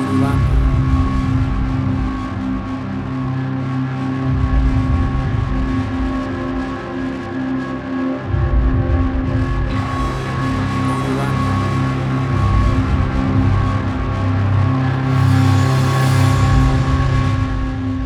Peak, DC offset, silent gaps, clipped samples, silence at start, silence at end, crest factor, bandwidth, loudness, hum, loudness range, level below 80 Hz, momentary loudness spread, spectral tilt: -2 dBFS; under 0.1%; none; under 0.1%; 0 s; 0 s; 14 dB; 12 kHz; -18 LUFS; none; 5 LU; -22 dBFS; 8 LU; -7.5 dB/octave